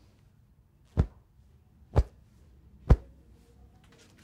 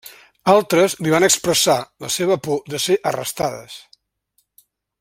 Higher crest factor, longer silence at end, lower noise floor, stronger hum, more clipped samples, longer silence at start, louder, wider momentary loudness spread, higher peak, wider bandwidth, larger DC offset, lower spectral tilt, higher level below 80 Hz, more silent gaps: first, 26 dB vs 18 dB; about the same, 1.25 s vs 1.2 s; second, -62 dBFS vs -67 dBFS; neither; neither; first, 0.95 s vs 0.05 s; second, -30 LUFS vs -18 LUFS; about the same, 11 LU vs 10 LU; second, -6 dBFS vs 0 dBFS; second, 8 kHz vs 16.5 kHz; neither; first, -9 dB/octave vs -3 dB/octave; first, -36 dBFS vs -58 dBFS; neither